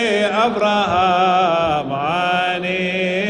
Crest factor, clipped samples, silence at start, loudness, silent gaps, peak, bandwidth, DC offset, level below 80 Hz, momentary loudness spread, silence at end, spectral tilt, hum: 12 dB; under 0.1%; 0 s; -17 LUFS; none; -6 dBFS; 10.5 kHz; under 0.1%; -50 dBFS; 5 LU; 0 s; -5 dB/octave; none